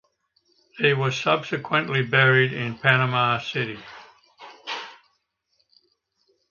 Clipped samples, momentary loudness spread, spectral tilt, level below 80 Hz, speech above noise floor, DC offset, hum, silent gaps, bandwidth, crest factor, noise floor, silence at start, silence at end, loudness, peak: under 0.1%; 16 LU; -5.5 dB/octave; -66 dBFS; 50 dB; under 0.1%; none; none; 7.2 kHz; 24 dB; -72 dBFS; 0.75 s; 1.55 s; -22 LUFS; -2 dBFS